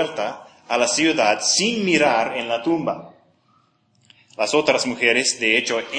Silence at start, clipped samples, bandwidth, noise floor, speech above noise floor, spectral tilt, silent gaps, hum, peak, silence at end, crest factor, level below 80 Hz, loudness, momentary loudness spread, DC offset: 0 s; under 0.1%; 10.5 kHz; -61 dBFS; 41 dB; -2 dB/octave; none; none; -2 dBFS; 0 s; 20 dB; -68 dBFS; -19 LUFS; 10 LU; under 0.1%